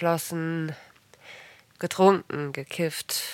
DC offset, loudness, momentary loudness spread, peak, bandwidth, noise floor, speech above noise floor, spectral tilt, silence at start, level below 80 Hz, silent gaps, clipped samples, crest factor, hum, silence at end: under 0.1%; -27 LUFS; 25 LU; -4 dBFS; 17 kHz; -50 dBFS; 24 dB; -4.5 dB/octave; 0 s; -74 dBFS; none; under 0.1%; 24 dB; none; 0 s